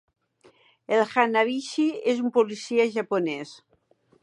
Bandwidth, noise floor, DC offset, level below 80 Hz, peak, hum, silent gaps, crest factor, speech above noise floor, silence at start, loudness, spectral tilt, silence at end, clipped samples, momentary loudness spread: 10.5 kHz; -63 dBFS; under 0.1%; -80 dBFS; -6 dBFS; none; none; 20 dB; 39 dB; 0.9 s; -24 LUFS; -4.5 dB/octave; 0.65 s; under 0.1%; 6 LU